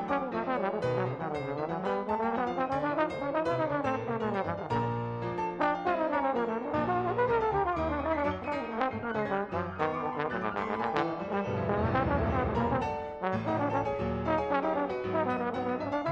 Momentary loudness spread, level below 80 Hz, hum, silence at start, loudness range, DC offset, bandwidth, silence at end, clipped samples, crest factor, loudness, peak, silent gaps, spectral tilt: 4 LU; -50 dBFS; none; 0 s; 2 LU; under 0.1%; 9 kHz; 0 s; under 0.1%; 20 dB; -31 LUFS; -12 dBFS; none; -8 dB/octave